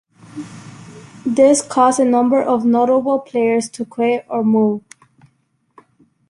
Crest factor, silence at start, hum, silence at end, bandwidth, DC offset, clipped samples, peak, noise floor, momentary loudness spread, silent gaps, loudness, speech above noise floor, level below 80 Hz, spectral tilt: 16 dB; 0.35 s; none; 1.5 s; 11.5 kHz; under 0.1%; under 0.1%; -2 dBFS; -63 dBFS; 21 LU; none; -16 LUFS; 48 dB; -62 dBFS; -5 dB/octave